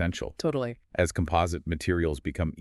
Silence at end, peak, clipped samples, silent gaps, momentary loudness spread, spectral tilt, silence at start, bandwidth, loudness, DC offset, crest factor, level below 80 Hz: 0 s; -10 dBFS; under 0.1%; none; 5 LU; -6 dB/octave; 0 s; 12.5 kHz; -29 LUFS; under 0.1%; 18 dB; -40 dBFS